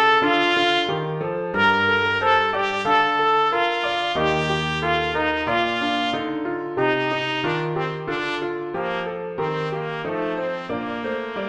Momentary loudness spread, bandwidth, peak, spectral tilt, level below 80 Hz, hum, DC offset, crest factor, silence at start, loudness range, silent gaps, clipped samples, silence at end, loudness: 9 LU; 10 kHz; -6 dBFS; -5 dB/octave; -50 dBFS; none; under 0.1%; 16 dB; 0 s; 7 LU; none; under 0.1%; 0 s; -22 LUFS